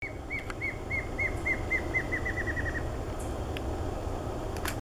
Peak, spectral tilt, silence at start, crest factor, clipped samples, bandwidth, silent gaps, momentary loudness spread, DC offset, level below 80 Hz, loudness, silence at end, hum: -16 dBFS; -5.5 dB/octave; 0 s; 16 dB; under 0.1%; over 20 kHz; none; 7 LU; under 0.1%; -40 dBFS; -33 LUFS; 0.15 s; none